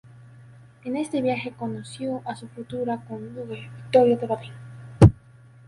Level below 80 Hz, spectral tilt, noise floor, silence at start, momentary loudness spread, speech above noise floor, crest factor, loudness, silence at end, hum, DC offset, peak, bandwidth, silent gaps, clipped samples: -40 dBFS; -8 dB/octave; -50 dBFS; 0.85 s; 21 LU; 24 dB; 24 dB; -24 LUFS; 0.55 s; none; under 0.1%; 0 dBFS; 11.5 kHz; none; under 0.1%